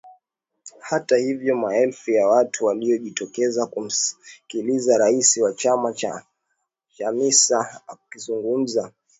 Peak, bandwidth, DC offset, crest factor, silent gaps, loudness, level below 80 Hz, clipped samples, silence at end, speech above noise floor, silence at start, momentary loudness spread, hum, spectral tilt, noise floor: -2 dBFS; 8.2 kHz; under 0.1%; 20 dB; none; -21 LUFS; -74 dBFS; under 0.1%; 0.3 s; 55 dB; 0.05 s; 14 LU; none; -2.5 dB/octave; -76 dBFS